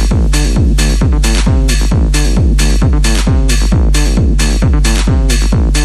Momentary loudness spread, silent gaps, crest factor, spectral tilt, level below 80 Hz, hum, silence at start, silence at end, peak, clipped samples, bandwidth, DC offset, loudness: 1 LU; none; 8 dB; -5 dB/octave; -10 dBFS; none; 0 s; 0 s; 0 dBFS; under 0.1%; 13 kHz; under 0.1%; -12 LUFS